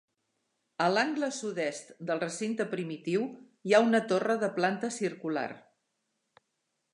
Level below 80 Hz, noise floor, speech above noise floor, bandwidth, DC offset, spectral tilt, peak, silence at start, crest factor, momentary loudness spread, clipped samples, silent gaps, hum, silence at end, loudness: -84 dBFS; -81 dBFS; 51 dB; 11.5 kHz; under 0.1%; -4.5 dB/octave; -10 dBFS; 0.8 s; 22 dB; 13 LU; under 0.1%; none; none; 1.35 s; -30 LUFS